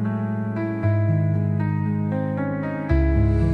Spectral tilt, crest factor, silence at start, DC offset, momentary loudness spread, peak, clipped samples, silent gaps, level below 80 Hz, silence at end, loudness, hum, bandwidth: -10.5 dB/octave; 12 dB; 0 s; under 0.1%; 6 LU; -8 dBFS; under 0.1%; none; -28 dBFS; 0 s; -23 LUFS; none; 4.8 kHz